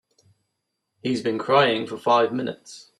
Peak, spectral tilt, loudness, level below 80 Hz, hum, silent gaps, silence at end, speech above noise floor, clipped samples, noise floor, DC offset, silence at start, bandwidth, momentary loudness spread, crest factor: -4 dBFS; -5 dB/octave; -22 LUFS; -70 dBFS; none; none; 0.2 s; 56 dB; under 0.1%; -79 dBFS; under 0.1%; 1.05 s; 12 kHz; 14 LU; 20 dB